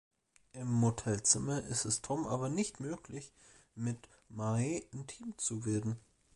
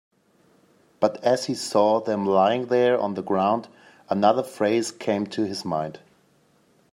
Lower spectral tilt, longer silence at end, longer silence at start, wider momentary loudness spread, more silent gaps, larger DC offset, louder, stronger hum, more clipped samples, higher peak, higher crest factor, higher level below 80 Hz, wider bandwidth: about the same, -4.5 dB/octave vs -5 dB/octave; second, 0.35 s vs 0.95 s; second, 0.55 s vs 1 s; first, 17 LU vs 7 LU; neither; neither; second, -35 LUFS vs -23 LUFS; neither; neither; second, -14 dBFS vs -6 dBFS; about the same, 22 dB vs 18 dB; first, -62 dBFS vs -72 dBFS; second, 11.5 kHz vs 15.5 kHz